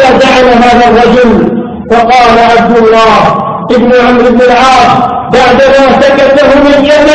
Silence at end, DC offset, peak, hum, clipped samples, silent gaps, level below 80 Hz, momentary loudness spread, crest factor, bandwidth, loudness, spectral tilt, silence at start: 0 s; under 0.1%; 0 dBFS; none; 5%; none; -28 dBFS; 5 LU; 4 dB; 11 kHz; -4 LUFS; -5 dB/octave; 0 s